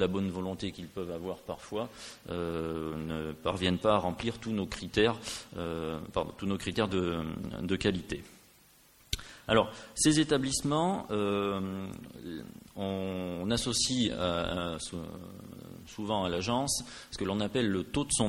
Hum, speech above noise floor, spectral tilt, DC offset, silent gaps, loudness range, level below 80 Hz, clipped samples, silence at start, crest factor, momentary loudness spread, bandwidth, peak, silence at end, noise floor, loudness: none; 29 dB; -4 dB/octave; under 0.1%; none; 4 LU; -52 dBFS; under 0.1%; 0 s; 24 dB; 13 LU; 16.5 kHz; -10 dBFS; 0 s; -61 dBFS; -32 LUFS